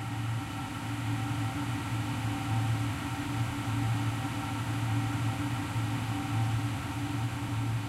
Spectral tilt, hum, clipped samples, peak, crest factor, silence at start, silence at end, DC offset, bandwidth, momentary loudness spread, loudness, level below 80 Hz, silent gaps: -5.5 dB/octave; none; under 0.1%; -20 dBFS; 12 dB; 0 s; 0 s; under 0.1%; 14.5 kHz; 4 LU; -33 LUFS; -50 dBFS; none